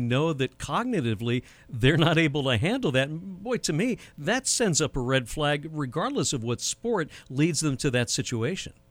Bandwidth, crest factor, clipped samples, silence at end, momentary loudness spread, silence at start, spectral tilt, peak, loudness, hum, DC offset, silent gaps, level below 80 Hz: 16.5 kHz; 20 dB; under 0.1%; 0.2 s; 8 LU; 0 s; -4.5 dB/octave; -8 dBFS; -26 LUFS; none; under 0.1%; none; -48 dBFS